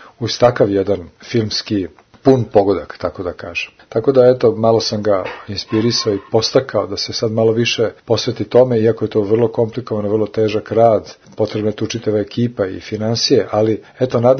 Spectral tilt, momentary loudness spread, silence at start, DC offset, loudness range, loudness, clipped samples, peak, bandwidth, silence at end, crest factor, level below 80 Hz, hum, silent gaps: -5.5 dB/octave; 9 LU; 0 s; under 0.1%; 2 LU; -16 LUFS; under 0.1%; 0 dBFS; 6.6 kHz; 0 s; 16 dB; -50 dBFS; none; none